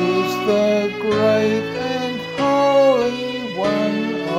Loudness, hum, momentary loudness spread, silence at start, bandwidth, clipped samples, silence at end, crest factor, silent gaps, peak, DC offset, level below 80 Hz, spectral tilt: -18 LUFS; none; 9 LU; 0 s; 16 kHz; under 0.1%; 0 s; 14 dB; none; -4 dBFS; under 0.1%; -56 dBFS; -5.5 dB/octave